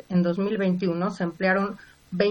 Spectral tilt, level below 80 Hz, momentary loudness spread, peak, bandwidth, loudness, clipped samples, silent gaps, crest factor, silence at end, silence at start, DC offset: -8 dB/octave; -62 dBFS; 9 LU; -8 dBFS; 7.8 kHz; -25 LUFS; under 0.1%; none; 16 dB; 0 s; 0.1 s; under 0.1%